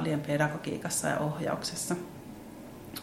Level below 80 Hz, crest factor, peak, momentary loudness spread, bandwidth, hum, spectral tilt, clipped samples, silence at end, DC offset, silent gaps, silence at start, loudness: -62 dBFS; 20 dB; -12 dBFS; 17 LU; 16.5 kHz; none; -4.5 dB/octave; under 0.1%; 0 s; under 0.1%; none; 0 s; -31 LUFS